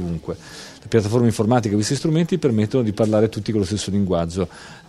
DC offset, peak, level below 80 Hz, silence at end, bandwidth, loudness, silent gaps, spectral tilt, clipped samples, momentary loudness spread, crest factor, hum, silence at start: under 0.1%; -2 dBFS; -46 dBFS; 0.1 s; 14 kHz; -20 LUFS; none; -6.5 dB/octave; under 0.1%; 11 LU; 18 dB; none; 0 s